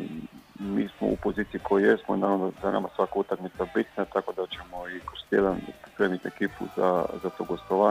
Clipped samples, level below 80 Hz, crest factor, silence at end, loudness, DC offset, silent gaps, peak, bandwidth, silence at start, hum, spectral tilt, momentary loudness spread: under 0.1%; -54 dBFS; 20 dB; 0 s; -28 LUFS; under 0.1%; none; -8 dBFS; 15.5 kHz; 0 s; none; -7 dB/octave; 13 LU